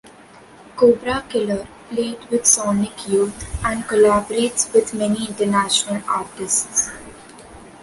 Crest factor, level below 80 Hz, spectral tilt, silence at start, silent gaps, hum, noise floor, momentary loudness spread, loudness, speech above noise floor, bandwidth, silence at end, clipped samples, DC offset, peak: 20 dB; -44 dBFS; -3 dB/octave; 0.05 s; none; none; -45 dBFS; 10 LU; -19 LUFS; 26 dB; 11.5 kHz; 0 s; under 0.1%; under 0.1%; 0 dBFS